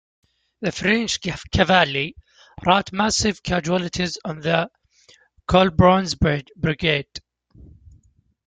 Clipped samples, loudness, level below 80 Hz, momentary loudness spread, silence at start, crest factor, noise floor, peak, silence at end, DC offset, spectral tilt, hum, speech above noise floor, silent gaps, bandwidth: under 0.1%; -20 LUFS; -40 dBFS; 12 LU; 0.6 s; 20 dB; -59 dBFS; -2 dBFS; 1.25 s; under 0.1%; -4.5 dB/octave; none; 39 dB; none; 9.4 kHz